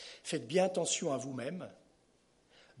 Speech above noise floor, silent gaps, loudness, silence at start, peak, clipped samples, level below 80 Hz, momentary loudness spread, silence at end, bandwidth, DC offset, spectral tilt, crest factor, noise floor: 36 dB; none; -35 LUFS; 0 s; -16 dBFS; under 0.1%; -80 dBFS; 13 LU; 0 s; 11.5 kHz; under 0.1%; -3.5 dB/octave; 20 dB; -70 dBFS